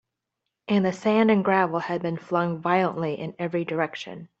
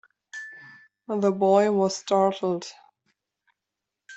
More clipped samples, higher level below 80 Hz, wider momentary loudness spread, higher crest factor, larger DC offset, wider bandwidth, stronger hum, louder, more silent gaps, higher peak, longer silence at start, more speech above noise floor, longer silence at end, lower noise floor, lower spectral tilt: neither; first, -68 dBFS vs -74 dBFS; second, 10 LU vs 20 LU; about the same, 18 dB vs 20 dB; neither; about the same, 8 kHz vs 8.2 kHz; neither; about the same, -24 LUFS vs -23 LUFS; neither; about the same, -6 dBFS vs -8 dBFS; first, 0.7 s vs 0.35 s; second, 59 dB vs 63 dB; first, 0.15 s vs 0 s; about the same, -83 dBFS vs -86 dBFS; first, -7 dB/octave vs -5.5 dB/octave